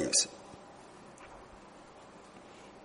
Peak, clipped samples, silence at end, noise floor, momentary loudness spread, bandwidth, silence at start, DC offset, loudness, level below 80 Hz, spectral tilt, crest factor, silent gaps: -14 dBFS; under 0.1%; 0 s; -54 dBFS; 23 LU; 10.5 kHz; 0 s; under 0.1%; -30 LUFS; -68 dBFS; -1 dB/octave; 26 dB; none